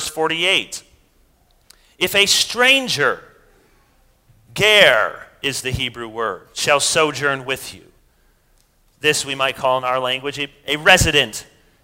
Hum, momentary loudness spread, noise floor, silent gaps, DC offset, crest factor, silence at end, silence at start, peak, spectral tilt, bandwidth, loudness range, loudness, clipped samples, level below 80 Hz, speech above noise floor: none; 14 LU; -58 dBFS; none; under 0.1%; 20 dB; 0.4 s; 0 s; 0 dBFS; -2 dB/octave; 16 kHz; 5 LU; -16 LUFS; under 0.1%; -44 dBFS; 40 dB